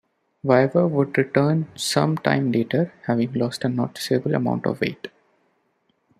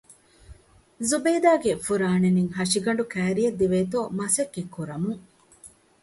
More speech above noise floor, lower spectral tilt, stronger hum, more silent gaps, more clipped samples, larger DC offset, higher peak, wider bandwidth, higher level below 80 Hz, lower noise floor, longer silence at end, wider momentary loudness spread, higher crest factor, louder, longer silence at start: first, 47 dB vs 28 dB; about the same, -6 dB/octave vs -5 dB/octave; neither; neither; neither; neither; first, -2 dBFS vs -8 dBFS; first, 15 kHz vs 12 kHz; second, -64 dBFS vs -56 dBFS; first, -68 dBFS vs -52 dBFS; first, 1.1 s vs 0.35 s; second, 7 LU vs 10 LU; about the same, 20 dB vs 18 dB; about the same, -22 LUFS vs -24 LUFS; first, 0.45 s vs 0.1 s